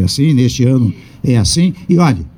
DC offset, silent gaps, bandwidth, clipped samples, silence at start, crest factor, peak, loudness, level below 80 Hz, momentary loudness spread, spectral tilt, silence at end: under 0.1%; none; 18 kHz; under 0.1%; 0 s; 10 dB; -2 dBFS; -13 LUFS; -34 dBFS; 4 LU; -6 dB/octave; 0.1 s